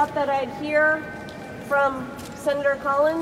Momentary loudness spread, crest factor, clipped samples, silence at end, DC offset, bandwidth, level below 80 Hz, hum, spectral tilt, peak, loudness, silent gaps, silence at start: 15 LU; 14 dB; under 0.1%; 0 s; under 0.1%; 15.5 kHz; -54 dBFS; none; -5 dB/octave; -10 dBFS; -23 LUFS; none; 0 s